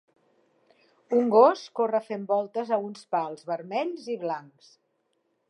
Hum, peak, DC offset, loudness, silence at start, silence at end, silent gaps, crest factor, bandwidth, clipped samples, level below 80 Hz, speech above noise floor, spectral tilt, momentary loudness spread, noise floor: none; -6 dBFS; under 0.1%; -26 LUFS; 1.1 s; 1.1 s; none; 22 dB; 10 kHz; under 0.1%; -88 dBFS; 48 dB; -6 dB/octave; 13 LU; -74 dBFS